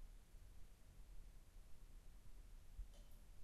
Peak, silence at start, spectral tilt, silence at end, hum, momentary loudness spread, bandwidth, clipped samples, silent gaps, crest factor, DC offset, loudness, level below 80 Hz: -42 dBFS; 0 s; -4.5 dB/octave; 0 s; none; 6 LU; 13 kHz; under 0.1%; none; 14 dB; under 0.1%; -66 LUFS; -60 dBFS